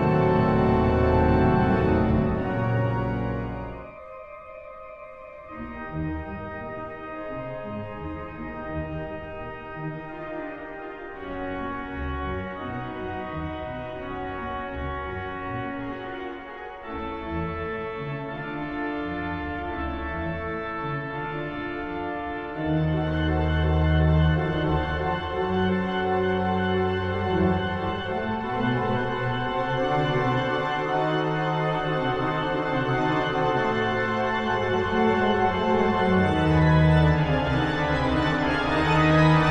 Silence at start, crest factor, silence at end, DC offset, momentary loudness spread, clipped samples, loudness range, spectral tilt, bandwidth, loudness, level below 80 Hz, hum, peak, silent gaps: 0 s; 18 dB; 0 s; under 0.1%; 14 LU; under 0.1%; 13 LU; -8 dB/octave; 8.6 kHz; -25 LUFS; -38 dBFS; none; -8 dBFS; none